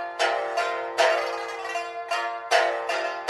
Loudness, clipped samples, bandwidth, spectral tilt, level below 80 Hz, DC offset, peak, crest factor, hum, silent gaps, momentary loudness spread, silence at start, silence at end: -25 LUFS; under 0.1%; 12.5 kHz; 0 dB/octave; -76 dBFS; under 0.1%; -6 dBFS; 20 dB; none; none; 8 LU; 0 s; 0 s